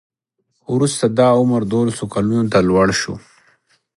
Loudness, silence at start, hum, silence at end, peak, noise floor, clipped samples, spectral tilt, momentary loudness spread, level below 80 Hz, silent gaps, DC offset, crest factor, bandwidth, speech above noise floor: -16 LUFS; 0.7 s; none; 0.8 s; 0 dBFS; -71 dBFS; under 0.1%; -5.5 dB/octave; 8 LU; -46 dBFS; none; under 0.1%; 16 dB; 11.5 kHz; 55 dB